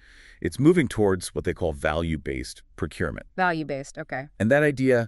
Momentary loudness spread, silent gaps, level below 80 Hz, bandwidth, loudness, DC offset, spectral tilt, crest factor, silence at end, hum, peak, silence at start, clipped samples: 13 LU; none; -44 dBFS; 12 kHz; -25 LUFS; under 0.1%; -6.5 dB/octave; 18 dB; 0 s; none; -6 dBFS; 0.45 s; under 0.1%